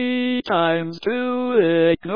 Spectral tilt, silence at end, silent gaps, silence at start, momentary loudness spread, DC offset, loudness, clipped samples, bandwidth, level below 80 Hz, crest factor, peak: -8 dB/octave; 0 s; none; 0 s; 6 LU; 0.4%; -20 LUFS; under 0.1%; 5.2 kHz; -54 dBFS; 14 dB; -4 dBFS